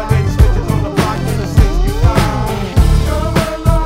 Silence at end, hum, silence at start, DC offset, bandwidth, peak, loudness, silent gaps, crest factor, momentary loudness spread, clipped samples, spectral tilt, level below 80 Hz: 0 s; none; 0 s; under 0.1%; 16 kHz; 0 dBFS; -14 LUFS; none; 12 dB; 3 LU; 0.7%; -6.5 dB/octave; -16 dBFS